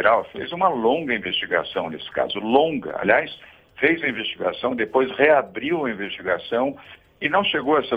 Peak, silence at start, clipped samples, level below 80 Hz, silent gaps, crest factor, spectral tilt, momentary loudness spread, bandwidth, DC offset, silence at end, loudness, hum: -2 dBFS; 0 s; under 0.1%; -58 dBFS; none; 20 dB; -7 dB/octave; 9 LU; 16 kHz; under 0.1%; 0 s; -22 LUFS; none